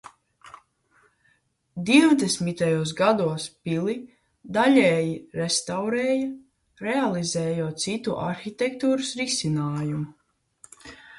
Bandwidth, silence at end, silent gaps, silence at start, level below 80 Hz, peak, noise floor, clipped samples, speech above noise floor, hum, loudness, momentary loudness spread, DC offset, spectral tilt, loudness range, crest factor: 11.5 kHz; 0 s; none; 0.05 s; -62 dBFS; -4 dBFS; -67 dBFS; under 0.1%; 44 dB; none; -24 LUFS; 15 LU; under 0.1%; -4.5 dB/octave; 4 LU; 20 dB